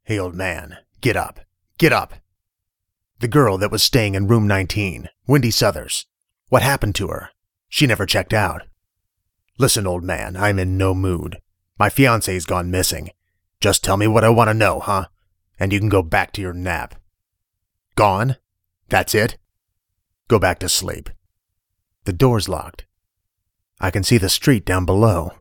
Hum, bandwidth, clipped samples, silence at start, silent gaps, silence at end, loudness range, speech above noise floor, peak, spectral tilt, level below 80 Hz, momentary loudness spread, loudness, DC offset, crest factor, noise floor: none; 19 kHz; under 0.1%; 0.1 s; none; 0.1 s; 4 LU; 62 dB; 0 dBFS; -4.5 dB/octave; -38 dBFS; 12 LU; -18 LUFS; under 0.1%; 20 dB; -80 dBFS